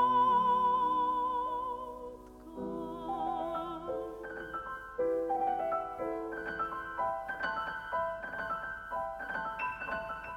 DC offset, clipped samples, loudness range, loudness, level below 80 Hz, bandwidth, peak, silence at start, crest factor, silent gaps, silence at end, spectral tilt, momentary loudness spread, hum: under 0.1%; under 0.1%; 5 LU; -34 LUFS; -60 dBFS; 13.5 kHz; -18 dBFS; 0 s; 16 dB; none; 0 s; -6 dB/octave; 13 LU; none